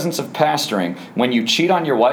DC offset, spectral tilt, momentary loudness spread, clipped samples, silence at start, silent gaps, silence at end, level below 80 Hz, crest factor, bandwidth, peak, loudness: under 0.1%; -4 dB/octave; 7 LU; under 0.1%; 0 s; none; 0 s; -72 dBFS; 16 dB; over 20 kHz; -2 dBFS; -18 LUFS